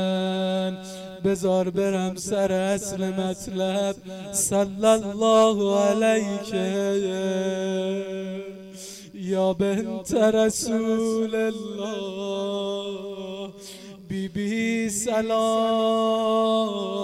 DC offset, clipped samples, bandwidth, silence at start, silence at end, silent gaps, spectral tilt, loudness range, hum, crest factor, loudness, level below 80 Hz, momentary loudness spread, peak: under 0.1%; under 0.1%; 16 kHz; 0 s; 0 s; none; -4.5 dB/octave; 6 LU; none; 18 dB; -24 LUFS; -58 dBFS; 14 LU; -6 dBFS